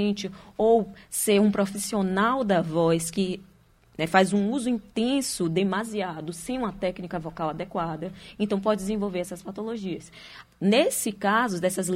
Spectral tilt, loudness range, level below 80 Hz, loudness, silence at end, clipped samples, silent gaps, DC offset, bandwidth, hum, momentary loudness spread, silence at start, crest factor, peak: -4.5 dB/octave; 6 LU; -56 dBFS; -26 LUFS; 0 s; under 0.1%; none; under 0.1%; 16 kHz; none; 13 LU; 0 s; 20 dB; -6 dBFS